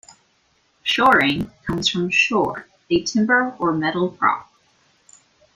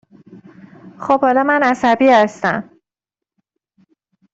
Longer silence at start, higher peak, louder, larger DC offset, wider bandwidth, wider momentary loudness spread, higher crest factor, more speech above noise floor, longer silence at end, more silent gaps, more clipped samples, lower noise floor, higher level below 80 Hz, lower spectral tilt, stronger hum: about the same, 0.85 s vs 0.85 s; about the same, -2 dBFS vs -2 dBFS; second, -19 LUFS vs -14 LUFS; neither; first, 15.5 kHz vs 8 kHz; about the same, 11 LU vs 10 LU; about the same, 20 dB vs 16 dB; second, 44 dB vs 72 dB; second, 1.1 s vs 1.7 s; neither; neither; second, -63 dBFS vs -86 dBFS; first, -52 dBFS vs -60 dBFS; second, -4 dB/octave vs -5.5 dB/octave; neither